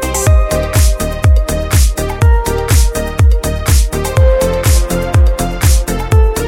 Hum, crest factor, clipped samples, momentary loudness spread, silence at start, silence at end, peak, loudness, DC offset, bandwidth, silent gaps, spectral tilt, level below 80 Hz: none; 10 dB; under 0.1%; 3 LU; 0 s; 0 s; 0 dBFS; -12 LUFS; under 0.1%; 17 kHz; none; -5 dB/octave; -12 dBFS